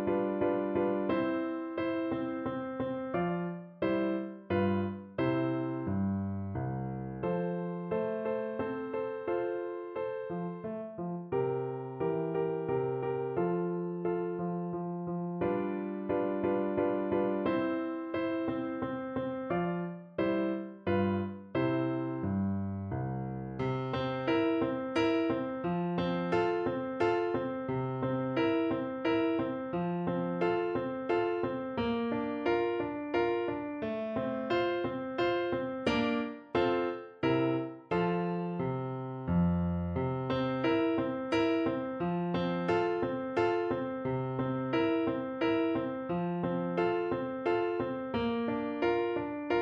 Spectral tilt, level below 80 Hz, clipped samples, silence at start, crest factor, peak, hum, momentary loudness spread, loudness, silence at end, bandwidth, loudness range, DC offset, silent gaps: -8.5 dB/octave; -60 dBFS; under 0.1%; 0 s; 16 dB; -16 dBFS; none; 6 LU; -33 LUFS; 0 s; 6.6 kHz; 3 LU; under 0.1%; none